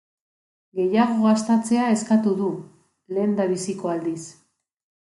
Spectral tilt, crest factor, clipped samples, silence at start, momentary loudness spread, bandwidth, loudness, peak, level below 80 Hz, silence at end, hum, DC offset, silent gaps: -6 dB/octave; 18 dB; under 0.1%; 0.75 s; 13 LU; 11.5 kHz; -22 LUFS; -6 dBFS; -70 dBFS; 0.85 s; none; under 0.1%; none